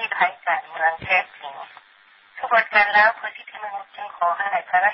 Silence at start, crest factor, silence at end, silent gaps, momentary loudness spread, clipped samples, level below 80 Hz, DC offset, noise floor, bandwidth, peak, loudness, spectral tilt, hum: 0 s; 18 dB; 0 s; none; 20 LU; under 0.1%; -62 dBFS; under 0.1%; -53 dBFS; 5.8 kHz; -4 dBFS; -20 LUFS; -6.5 dB/octave; none